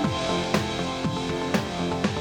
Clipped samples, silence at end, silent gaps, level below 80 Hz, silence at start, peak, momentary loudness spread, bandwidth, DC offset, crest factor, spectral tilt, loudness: under 0.1%; 0 s; none; -46 dBFS; 0 s; -8 dBFS; 3 LU; over 20 kHz; under 0.1%; 18 dB; -5 dB/octave; -26 LUFS